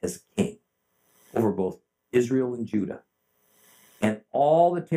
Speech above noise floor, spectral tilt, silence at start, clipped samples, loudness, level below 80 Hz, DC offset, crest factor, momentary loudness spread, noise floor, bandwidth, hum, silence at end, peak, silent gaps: 48 dB; -7 dB/octave; 0.05 s; under 0.1%; -26 LUFS; -68 dBFS; under 0.1%; 18 dB; 11 LU; -72 dBFS; 16 kHz; none; 0 s; -8 dBFS; none